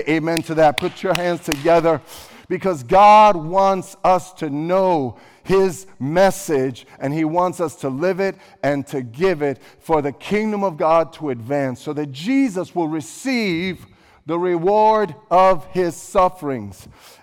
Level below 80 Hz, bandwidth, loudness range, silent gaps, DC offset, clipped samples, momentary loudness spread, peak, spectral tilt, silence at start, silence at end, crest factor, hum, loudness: -48 dBFS; 18 kHz; 6 LU; none; under 0.1%; under 0.1%; 12 LU; -4 dBFS; -5.5 dB/octave; 0 s; 0.5 s; 14 dB; none; -19 LUFS